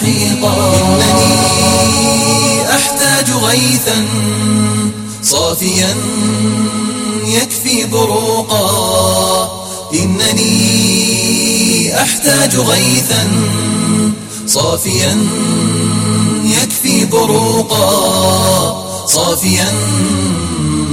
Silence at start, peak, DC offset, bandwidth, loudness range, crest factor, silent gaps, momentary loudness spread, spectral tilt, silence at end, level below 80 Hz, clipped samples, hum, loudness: 0 s; 0 dBFS; under 0.1%; 16.5 kHz; 3 LU; 12 dB; none; 5 LU; -3.5 dB/octave; 0 s; -40 dBFS; under 0.1%; none; -11 LUFS